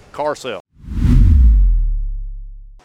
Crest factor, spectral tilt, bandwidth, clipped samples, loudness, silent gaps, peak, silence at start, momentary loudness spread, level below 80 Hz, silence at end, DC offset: 14 dB; -8 dB/octave; 8.2 kHz; under 0.1%; -16 LUFS; 0.60-0.65 s; 0 dBFS; 0.15 s; 20 LU; -14 dBFS; 0.2 s; under 0.1%